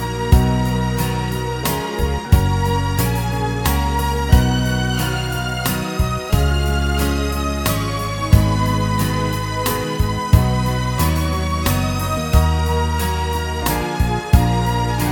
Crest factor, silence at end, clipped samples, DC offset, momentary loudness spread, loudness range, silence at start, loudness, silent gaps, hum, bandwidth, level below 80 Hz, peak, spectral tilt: 18 dB; 0 s; under 0.1%; under 0.1%; 6 LU; 1 LU; 0 s; -19 LUFS; none; none; 19 kHz; -22 dBFS; 0 dBFS; -5.5 dB/octave